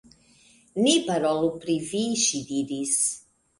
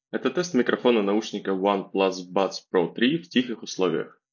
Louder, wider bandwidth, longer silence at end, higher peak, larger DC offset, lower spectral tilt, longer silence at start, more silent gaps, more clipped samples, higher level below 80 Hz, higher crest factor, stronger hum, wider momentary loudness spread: about the same, -24 LUFS vs -25 LUFS; first, 11.5 kHz vs 7.2 kHz; first, 0.4 s vs 0.25 s; about the same, -6 dBFS vs -4 dBFS; neither; second, -3 dB/octave vs -5 dB/octave; first, 0.75 s vs 0.15 s; neither; neither; first, -64 dBFS vs -74 dBFS; about the same, 20 dB vs 20 dB; neither; first, 8 LU vs 5 LU